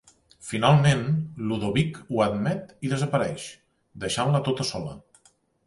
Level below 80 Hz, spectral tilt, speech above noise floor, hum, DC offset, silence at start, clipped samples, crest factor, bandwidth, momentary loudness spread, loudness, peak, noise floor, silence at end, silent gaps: -54 dBFS; -6 dB/octave; 38 dB; none; under 0.1%; 0.4 s; under 0.1%; 20 dB; 11.5 kHz; 15 LU; -25 LUFS; -6 dBFS; -62 dBFS; 0.65 s; none